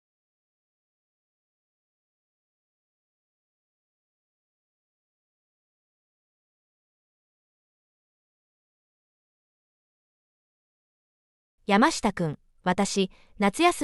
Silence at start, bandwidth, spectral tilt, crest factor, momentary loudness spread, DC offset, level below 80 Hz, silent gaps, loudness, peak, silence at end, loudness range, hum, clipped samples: 11.7 s; 11.5 kHz; -4.5 dB/octave; 24 dB; 10 LU; under 0.1%; -62 dBFS; none; -25 LUFS; -8 dBFS; 0 s; 4 LU; none; under 0.1%